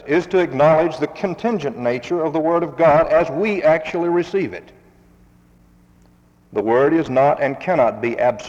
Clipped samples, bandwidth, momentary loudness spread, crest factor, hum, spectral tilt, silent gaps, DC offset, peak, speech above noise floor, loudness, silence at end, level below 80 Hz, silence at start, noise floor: under 0.1%; 7.8 kHz; 9 LU; 14 dB; none; -7 dB/octave; none; under 0.1%; -4 dBFS; 35 dB; -18 LUFS; 0 s; -52 dBFS; 0.05 s; -53 dBFS